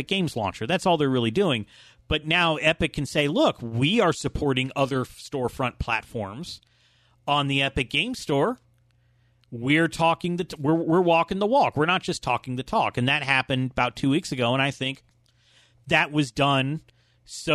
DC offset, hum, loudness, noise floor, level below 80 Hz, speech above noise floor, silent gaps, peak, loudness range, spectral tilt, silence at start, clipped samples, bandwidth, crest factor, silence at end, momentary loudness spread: under 0.1%; none; -24 LUFS; -63 dBFS; -48 dBFS; 39 dB; none; -4 dBFS; 4 LU; -5 dB/octave; 0 s; under 0.1%; 13.5 kHz; 20 dB; 0 s; 11 LU